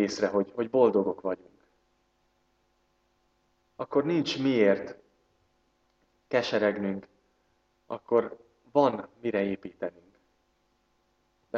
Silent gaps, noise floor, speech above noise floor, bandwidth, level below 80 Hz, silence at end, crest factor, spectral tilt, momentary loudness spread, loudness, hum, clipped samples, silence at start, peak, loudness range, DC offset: none; -72 dBFS; 44 dB; 7.8 kHz; -72 dBFS; 0 s; 20 dB; -6 dB/octave; 15 LU; -28 LUFS; none; under 0.1%; 0 s; -10 dBFS; 4 LU; under 0.1%